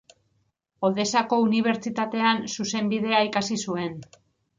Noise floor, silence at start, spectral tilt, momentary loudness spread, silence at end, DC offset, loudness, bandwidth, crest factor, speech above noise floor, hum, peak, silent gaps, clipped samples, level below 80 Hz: -71 dBFS; 0.8 s; -4 dB/octave; 7 LU; 0.55 s; under 0.1%; -24 LUFS; 7.6 kHz; 18 dB; 47 dB; none; -6 dBFS; none; under 0.1%; -68 dBFS